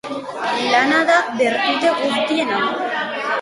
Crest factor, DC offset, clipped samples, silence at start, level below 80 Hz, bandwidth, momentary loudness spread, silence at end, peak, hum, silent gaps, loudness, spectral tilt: 16 dB; under 0.1%; under 0.1%; 0.05 s; -64 dBFS; 11.5 kHz; 8 LU; 0 s; -2 dBFS; none; none; -18 LUFS; -3 dB/octave